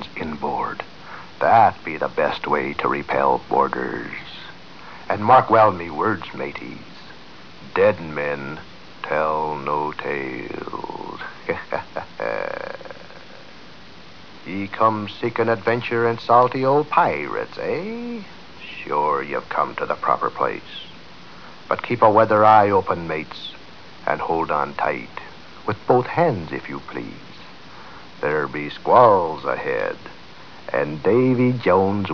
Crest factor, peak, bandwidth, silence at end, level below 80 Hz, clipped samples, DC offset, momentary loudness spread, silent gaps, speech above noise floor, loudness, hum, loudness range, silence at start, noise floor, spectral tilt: 20 dB; -2 dBFS; 5.4 kHz; 0 s; -56 dBFS; under 0.1%; 0.8%; 24 LU; none; 24 dB; -20 LUFS; none; 8 LU; 0 s; -43 dBFS; -7.5 dB/octave